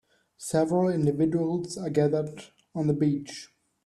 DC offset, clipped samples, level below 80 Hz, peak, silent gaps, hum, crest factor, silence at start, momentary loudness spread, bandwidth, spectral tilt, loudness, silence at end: under 0.1%; under 0.1%; -64 dBFS; -10 dBFS; none; none; 16 dB; 0.4 s; 15 LU; 12.5 kHz; -7 dB/octave; -27 LUFS; 0.4 s